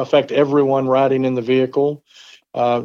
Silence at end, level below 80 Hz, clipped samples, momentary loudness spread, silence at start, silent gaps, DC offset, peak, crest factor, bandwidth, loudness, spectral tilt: 0 s; -68 dBFS; under 0.1%; 6 LU; 0 s; none; under 0.1%; -2 dBFS; 14 dB; 7.2 kHz; -17 LUFS; -7.5 dB/octave